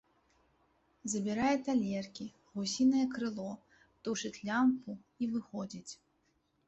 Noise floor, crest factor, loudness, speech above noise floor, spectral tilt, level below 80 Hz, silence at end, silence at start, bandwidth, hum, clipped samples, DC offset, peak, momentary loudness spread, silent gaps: -76 dBFS; 16 dB; -35 LUFS; 42 dB; -4.5 dB/octave; -72 dBFS; 0.75 s; 1.05 s; 8.2 kHz; none; under 0.1%; under 0.1%; -20 dBFS; 17 LU; none